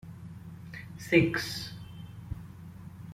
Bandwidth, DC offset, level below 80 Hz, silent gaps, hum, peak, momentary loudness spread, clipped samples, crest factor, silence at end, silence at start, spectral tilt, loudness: 16 kHz; under 0.1%; -56 dBFS; none; none; -10 dBFS; 22 LU; under 0.1%; 24 dB; 0 s; 0.05 s; -5.5 dB/octave; -29 LUFS